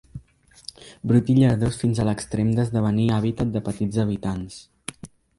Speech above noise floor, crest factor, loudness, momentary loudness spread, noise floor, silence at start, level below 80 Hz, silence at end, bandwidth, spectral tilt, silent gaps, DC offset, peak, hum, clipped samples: 32 dB; 16 dB; -22 LUFS; 21 LU; -54 dBFS; 0.15 s; -46 dBFS; 0.3 s; 11.5 kHz; -7.5 dB/octave; none; under 0.1%; -6 dBFS; none; under 0.1%